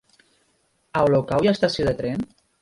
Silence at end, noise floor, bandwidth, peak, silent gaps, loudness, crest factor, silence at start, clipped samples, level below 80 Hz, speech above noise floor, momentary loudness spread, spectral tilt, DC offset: 0.35 s; -66 dBFS; 11.5 kHz; -4 dBFS; none; -22 LUFS; 18 dB; 0.95 s; under 0.1%; -48 dBFS; 46 dB; 10 LU; -6.5 dB/octave; under 0.1%